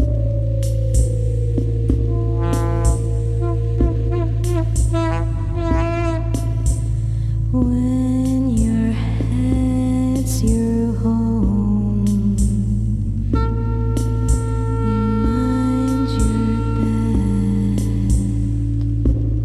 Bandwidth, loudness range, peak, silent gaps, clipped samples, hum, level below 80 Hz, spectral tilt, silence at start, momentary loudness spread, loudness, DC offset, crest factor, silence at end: 12.5 kHz; 1 LU; -2 dBFS; none; under 0.1%; none; -22 dBFS; -8 dB/octave; 0 s; 3 LU; -19 LUFS; under 0.1%; 14 dB; 0 s